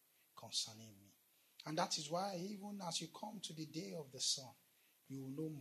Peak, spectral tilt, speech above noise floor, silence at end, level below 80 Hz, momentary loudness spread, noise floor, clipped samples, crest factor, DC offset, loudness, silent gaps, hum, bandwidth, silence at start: -24 dBFS; -3 dB/octave; 28 dB; 0 s; under -90 dBFS; 17 LU; -74 dBFS; under 0.1%; 22 dB; under 0.1%; -44 LUFS; none; none; 13.5 kHz; 0.35 s